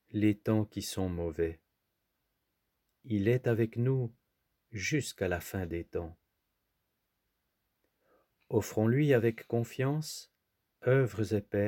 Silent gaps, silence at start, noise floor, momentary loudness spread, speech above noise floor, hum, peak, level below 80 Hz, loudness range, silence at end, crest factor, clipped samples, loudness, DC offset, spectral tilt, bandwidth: none; 0.15 s; -82 dBFS; 10 LU; 51 dB; none; -14 dBFS; -60 dBFS; 8 LU; 0 s; 20 dB; under 0.1%; -32 LUFS; under 0.1%; -6.5 dB/octave; 17 kHz